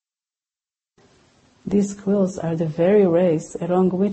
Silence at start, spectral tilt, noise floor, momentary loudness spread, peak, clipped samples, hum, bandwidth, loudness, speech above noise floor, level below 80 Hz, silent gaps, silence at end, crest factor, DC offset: 1.65 s; -8 dB/octave; under -90 dBFS; 8 LU; -6 dBFS; under 0.1%; none; 8.6 kHz; -20 LUFS; over 71 dB; -56 dBFS; none; 0 s; 14 dB; under 0.1%